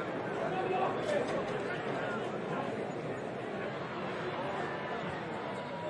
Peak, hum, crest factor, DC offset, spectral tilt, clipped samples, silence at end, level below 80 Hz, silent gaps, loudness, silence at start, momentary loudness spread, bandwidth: -22 dBFS; none; 14 dB; under 0.1%; -6 dB/octave; under 0.1%; 0 s; -70 dBFS; none; -36 LUFS; 0 s; 6 LU; 11.5 kHz